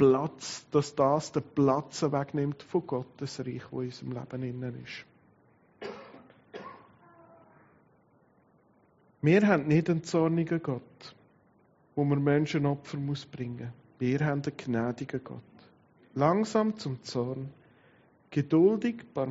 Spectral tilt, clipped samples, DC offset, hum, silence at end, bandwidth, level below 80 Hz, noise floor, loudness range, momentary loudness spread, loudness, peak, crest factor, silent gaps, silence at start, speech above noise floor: -6.5 dB/octave; under 0.1%; under 0.1%; none; 0 s; 8 kHz; -68 dBFS; -65 dBFS; 14 LU; 19 LU; -30 LUFS; -10 dBFS; 22 dB; none; 0 s; 36 dB